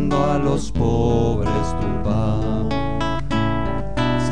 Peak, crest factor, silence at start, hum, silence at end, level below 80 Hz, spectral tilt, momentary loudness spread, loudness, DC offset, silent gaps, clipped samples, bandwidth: -6 dBFS; 14 dB; 0 s; none; 0 s; -30 dBFS; -7 dB/octave; 5 LU; -21 LUFS; 5%; none; under 0.1%; 10 kHz